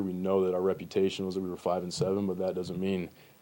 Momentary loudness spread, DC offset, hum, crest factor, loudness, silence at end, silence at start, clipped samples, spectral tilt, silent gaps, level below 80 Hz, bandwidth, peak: 6 LU; under 0.1%; none; 16 dB; -31 LUFS; 0.3 s; 0 s; under 0.1%; -6.5 dB/octave; none; -66 dBFS; 16.5 kHz; -16 dBFS